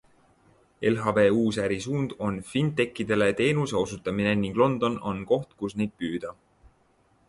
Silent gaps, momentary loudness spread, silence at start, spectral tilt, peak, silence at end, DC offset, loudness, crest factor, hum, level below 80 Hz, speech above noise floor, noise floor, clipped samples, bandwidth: none; 10 LU; 0.8 s; -6 dB/octave; -8 dBFS; 0.95 s; under 0.1%; -26 LUFS; 18 dB; none; -56 dBFS; 39 dB; -64 dBFS; under 0.1%; 11.5 kHz